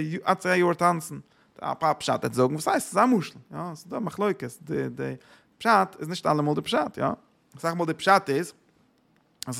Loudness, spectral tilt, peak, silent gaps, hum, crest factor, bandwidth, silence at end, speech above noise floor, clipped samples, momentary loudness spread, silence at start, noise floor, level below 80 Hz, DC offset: -26 LUFS; -5 dB/octave; -6 dBFS; none; none; 20 dB; 16.5 kHz; 0 s; 39 dB; under 0.1%; 15 LU; 0 s; -65 dBFS; -68 dBFS; under 0.1%